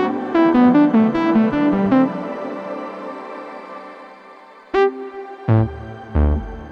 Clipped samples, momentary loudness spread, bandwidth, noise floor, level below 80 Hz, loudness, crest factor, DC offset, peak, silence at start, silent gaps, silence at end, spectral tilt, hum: under 0.1%; 20 LU; 6.6 kHz; -43 dBFS; -30 dBFS; -18 LUFS; 16 dB; under 0.1%; -2 dBFS; 0 s; none; 0 s; -9.5 dB/octave; none